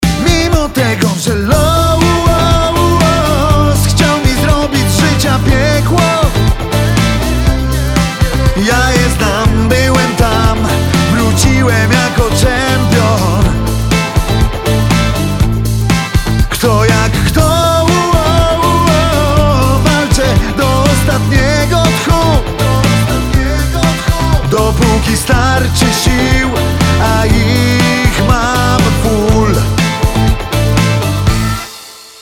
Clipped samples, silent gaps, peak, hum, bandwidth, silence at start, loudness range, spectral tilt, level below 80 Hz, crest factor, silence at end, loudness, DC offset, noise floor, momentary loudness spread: under 0.1%; none; 0 dBFS; none; 17.5 kHz; 0 s; 2 LU; -5 dB/octave; -18 dBFS; 10 dB; 0.1 s; -11 LUFS; under 0.1%; -32 dBFS; 3 LU